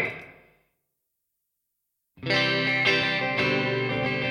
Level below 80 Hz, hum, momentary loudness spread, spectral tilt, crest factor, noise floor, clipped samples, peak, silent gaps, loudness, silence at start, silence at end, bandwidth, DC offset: -62 dBFS; none; 9 LU; -5 dB/octave; 20 dB; -80 dBFS; under 0.1%; -8 dBFS; none; -23 LUFS; 0 s; 0 s; 13 kHz; under 0.1%